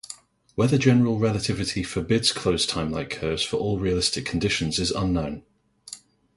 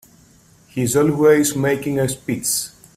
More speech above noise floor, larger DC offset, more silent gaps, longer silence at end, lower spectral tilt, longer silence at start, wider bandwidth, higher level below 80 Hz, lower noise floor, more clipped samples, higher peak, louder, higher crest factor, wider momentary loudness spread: second, 22 dB vs 33 dB; neither; neither; about the same, 0.4 s vs 0.3 s; about the same, -4.5 dB/octave vs -4.5 dB/octave; second, 0.1 s vs 0.75 s; second, 11.5 kHz vs 16 kHz; first, -44 dBFS vs -52 dBFS; second, -46 dBFS vs -51 dBFS; neither; second, -6 dBFS vs -2 dBFS; second, -24 LUFS vs -18 LUFS; about the same, 20 dB vs 16 dB; first, 20 LU vs 8 LU